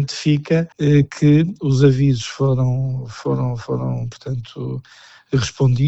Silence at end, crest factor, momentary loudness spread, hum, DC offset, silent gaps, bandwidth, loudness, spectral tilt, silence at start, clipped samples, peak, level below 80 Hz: 0 s; 16 dB; 13 LU; none; under 0.1%; none; 8.2 kHz; -19 LUFS; -7 dB/octave; 0 s; under 0.1%; -2 dBFS; -42 dBFS